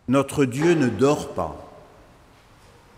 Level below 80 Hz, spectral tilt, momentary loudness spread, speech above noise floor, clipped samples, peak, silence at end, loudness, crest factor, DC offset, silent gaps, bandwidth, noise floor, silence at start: -52 dBFS; -6 dB/octave; 12 LU; 31 dB; under 0.1%; -8 dBFS; 1.2 s; -22 LUFS; 16 dB; under 0.1%; none; 16 kHz; -52 dBFS; 0.1 s